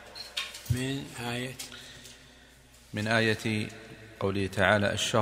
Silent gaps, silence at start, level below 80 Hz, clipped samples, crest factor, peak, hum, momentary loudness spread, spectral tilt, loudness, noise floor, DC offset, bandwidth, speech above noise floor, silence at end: none; 0 s; -58 dBFS; under 0.1%; 26 dB; -6 dBFS; none; 20 LU; -4.5 dB/octave; -30 LUFS; -55 dBFS; under 0.1%; 16 kHz; 27 dB; 0 s